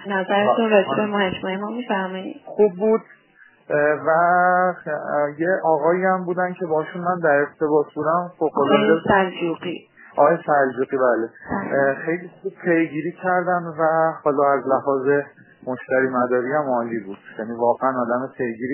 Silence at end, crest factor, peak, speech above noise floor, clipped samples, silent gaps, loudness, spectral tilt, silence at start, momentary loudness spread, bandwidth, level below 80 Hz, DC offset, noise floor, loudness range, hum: 0 s; 18 dB; -2 dBFS; 33 dB; under 0.1%; none; -20 LUFS; -10 dB/octave; 0 s; 11 LU; 3.2 kHz; -60 dBFS; under 0.1%; -53 dBFS; 3 LU; none